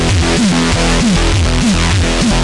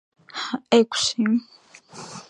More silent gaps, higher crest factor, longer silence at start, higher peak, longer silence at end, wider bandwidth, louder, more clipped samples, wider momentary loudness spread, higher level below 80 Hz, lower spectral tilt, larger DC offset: neither; second, 10 dB vs 22 dB; second, 0 s vs 0.35 s; about the same, 0 dBFS vs -2 dBFS; about the same, 0 s vs 0.1 s; about the same, 11.5 kHz vs 10.5 kHz; first, -12 LUFS vs -22 LUFS; neither; second, 1 LU vs 19 LU; first, -18 dBFS vs -68 dBFS; about the same, -4.5 dB/octave vs -3.5 dB/octave; neither